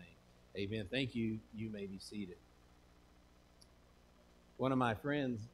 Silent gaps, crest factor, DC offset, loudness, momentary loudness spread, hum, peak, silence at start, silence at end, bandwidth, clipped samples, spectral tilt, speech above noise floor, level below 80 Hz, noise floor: none; 22 dB; under 0.1%; -40 LUFS; 16 LU; 60 Hz at -65 dBFS; -20 dBFS; 0 s; 0.05 s; 14 kHz; under 0.1%; -6.5 dB/octave; 26 dB; -66 dBFS; -66 dBFS